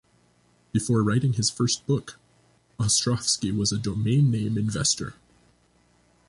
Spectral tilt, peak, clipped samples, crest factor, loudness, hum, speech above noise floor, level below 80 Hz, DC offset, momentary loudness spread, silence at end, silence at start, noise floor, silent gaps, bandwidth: -4.5 dB/octave; -10 dBFS; under 0.1%; 16 dB; -24 LUFS; 60 Hz at -45 dBFS; 39 dB; -52 dBFS; under 0.1%; 7 LU; 1.15 s; 0.75 s; -63 dBFS; none; 11.5 kHz